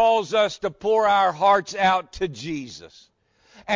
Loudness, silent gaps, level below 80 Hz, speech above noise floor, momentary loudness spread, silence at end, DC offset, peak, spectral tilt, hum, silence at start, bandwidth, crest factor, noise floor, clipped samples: -21 LUFS; none; -54 dBFS; 33 dB; 15 LU; 0 s; under 0.1%; -8 dBFS; -4 dB/octave; none; 0 s; 7.6 kHz; 14 dB; -55 dBFS; under 0.1%